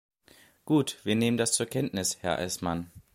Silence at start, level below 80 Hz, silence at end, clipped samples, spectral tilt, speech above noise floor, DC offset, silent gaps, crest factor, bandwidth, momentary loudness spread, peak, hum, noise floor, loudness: 0.65 s; -58 dBFS; 0.15 s; under 0.1%; -4 dB/octave; 31 dB; under 0.1%; none; 20 dB; 16.5 kHz; 6 LU; -10 dBFS; none; -59 dBFS; -28 LUFS